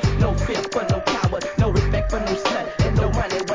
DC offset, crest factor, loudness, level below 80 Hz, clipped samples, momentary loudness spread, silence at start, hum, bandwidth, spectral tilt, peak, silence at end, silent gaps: 0.1%; 14 dB; -22 LUFS; -28 dBFS; under 0.1%; 3 LU; 0 s; none; 7.6 kHz; -6 dB/octave; -6 dBFS; 0 s; none